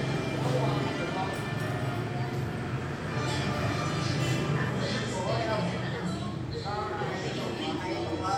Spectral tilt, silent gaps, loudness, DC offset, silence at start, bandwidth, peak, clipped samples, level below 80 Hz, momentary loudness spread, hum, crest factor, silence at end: -6 dB/octave; none; -31 LUFS; under 0.1%; 0 s; 15 kHz; -16 dBFS; under 0.1%; -52 dBFS; 5 LU; none; 14 dB; 0 s